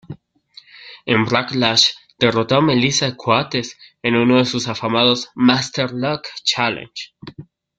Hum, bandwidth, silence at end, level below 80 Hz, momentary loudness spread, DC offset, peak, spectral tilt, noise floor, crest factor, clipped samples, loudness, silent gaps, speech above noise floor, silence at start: none; 9.2 kHz; 0.35 s; -56 dBFS; 15 LU; under 0.1%; 0 dBFS; -4 dB/octave; -48 dBFS; 18 dB; under 0.1%; -17 LUFS; none; 30 dB; 0.1 s